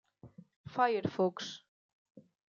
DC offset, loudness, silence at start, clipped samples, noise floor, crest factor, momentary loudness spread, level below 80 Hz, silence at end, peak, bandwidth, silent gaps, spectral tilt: under 0.1%; -34 LUFS; 0.25 s; under 0.1%; -57 dBFS; 22 dB; 19 LU; -78 dBFS; 0.3 s; -16 dBFS; 7.4 kHz; 0.56-0.64 s, 1.68-2.15 s; -5.5 dB/octave